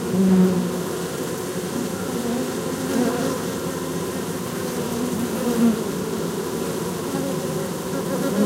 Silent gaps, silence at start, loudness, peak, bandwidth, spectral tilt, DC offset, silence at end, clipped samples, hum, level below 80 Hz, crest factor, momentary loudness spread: none; 0 s; -24 LUFS; -6 dBFS; 16 kHz; -5.5 dB/octave; under 0.1%; 0 s; under 0.1%; none; -54 dBFS; 16 dB; 7 LU